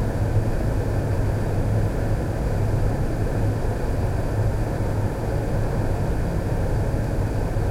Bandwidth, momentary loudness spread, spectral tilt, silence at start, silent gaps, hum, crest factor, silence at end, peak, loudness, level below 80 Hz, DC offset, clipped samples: 15.5 kHz; 2 LU; -8 dB/octave; 0 s; none; none; 12 dB; 0 s; -10 dBFS; -25 LUFS; -26 dBFS; under 0.1%; under 0.1%